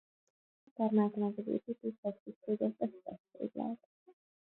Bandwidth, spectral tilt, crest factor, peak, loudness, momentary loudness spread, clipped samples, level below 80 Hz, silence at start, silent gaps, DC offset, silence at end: 4 kHz; -9 dB/octave; 20 dB; -18 dBFS; -37 LUFS; 17 LU; under 0.1%; -84 dBFS; 0.8 s; 1.98-2.03 s, 2.20-2.26 s, 2.36-2.41 s, 3.20-3.24 s, 3.85-4.06 s; under 0.1%; 0.3 s